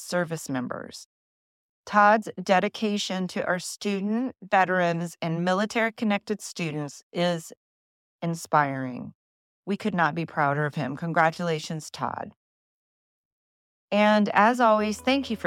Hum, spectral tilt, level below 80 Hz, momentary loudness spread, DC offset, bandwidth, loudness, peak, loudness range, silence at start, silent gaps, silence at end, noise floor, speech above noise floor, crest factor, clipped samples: none; -5 dB/octave; -72 dBFS; 14 LU; under 0.1%; 15.5 kHz; -25 LUFS; -6 dBFS; 5 LU; 0 s; 1.06-1.84 s, 7.03-7.11 s, 7.57-8.19 s, 9.15-9.63 s, 12.36-13.88 s; 0 s; under -90 dBFS; over 65 dB; 20 dB; under 0.1%